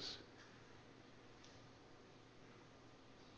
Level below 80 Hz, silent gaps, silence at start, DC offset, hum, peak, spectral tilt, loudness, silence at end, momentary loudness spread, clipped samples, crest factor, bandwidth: -78 dBFS; none; 0 s; under 0.1%; none; -38 dBFS; -3.5 dB/octave; -61 LUFS; 0 s; 6 LU; under 0.1%; 22 dB; 8.2 kHz